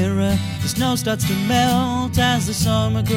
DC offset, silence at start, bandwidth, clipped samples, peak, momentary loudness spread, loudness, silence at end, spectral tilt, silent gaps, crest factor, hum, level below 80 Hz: under 0.1%; 0 s; 17 kHz; under 0.1%; -2 dBFS; 4 LU; -19 LUFS; 0 s; -5 dB/octave; none; 16 dB; none; -38 dBFS